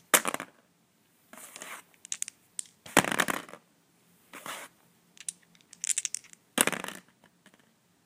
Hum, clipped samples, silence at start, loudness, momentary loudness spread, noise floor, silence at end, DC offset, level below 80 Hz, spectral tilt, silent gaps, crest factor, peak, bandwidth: none; under 0.1%; 0.15 s; -31 LUFS; 21 LU; -68 dBFS; 1.05 s; under 0.1%; -72 dBFS; -1.5 dB/octave; none; 34 dB; 0 dBFS; 16 kHz